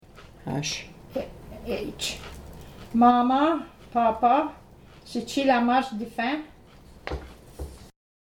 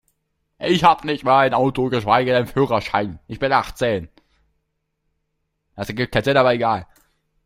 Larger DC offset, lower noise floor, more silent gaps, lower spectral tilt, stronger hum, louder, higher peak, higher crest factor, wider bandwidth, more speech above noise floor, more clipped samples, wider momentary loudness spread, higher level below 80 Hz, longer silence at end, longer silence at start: neither; second, -50 dBFS vs -73 dBFS; neither; second, -4.5 dB/octave vs -6 dB/octave; neither; second, -25 LUFS vs -19 LUFS; second, -6 dBFS vs -2 dBFS; about the same, 20 dB vs 20 dB; about the same, 16.5 kHz vs 16 kHz; second, 26 dB vs 55 dB; neither; first, 21 LU vs 11 LU; about the same, -48 dBFS vs -48 dBFS; second, 0.35 s vs 0.6 s; second, 0.2 s vs 0.6 s